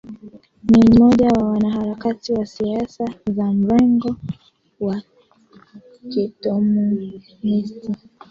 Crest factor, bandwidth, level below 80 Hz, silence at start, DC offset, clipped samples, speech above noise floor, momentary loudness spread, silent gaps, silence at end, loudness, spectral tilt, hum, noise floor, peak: 16 dB; 7.2 kHz; -44 dBFS; 0.05 s; under 0.1%; under 0.1%; 34 dB; 17 LU; none; 0.35 s; -18 LUFS; -8 dB/octave; none; -51 dBFS; -2 dBFS